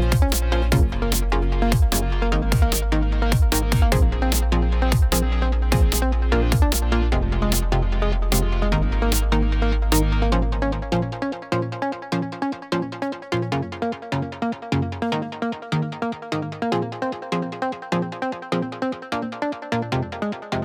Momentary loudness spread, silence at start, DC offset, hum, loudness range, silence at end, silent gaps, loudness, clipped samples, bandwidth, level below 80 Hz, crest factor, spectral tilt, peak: 8 LU; 0 s; under 0.1%; none; 6 LU; 0 s; none; -23 LUFS; under 0.1%; over 20 kHz; -22 dBFS; 16 dB; -5.5 dB/octave; -4 dBFS